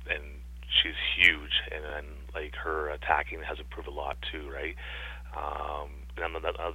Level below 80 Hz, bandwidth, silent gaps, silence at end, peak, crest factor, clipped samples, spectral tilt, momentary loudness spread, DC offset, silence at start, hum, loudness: -42 dBFS; 16 kHz; none; 0 s; -6 dBFS; 26 dB; under 0.1%; -4 dB/octave; 18 LU; under 0.1%; 0 s; none; -30 LUFS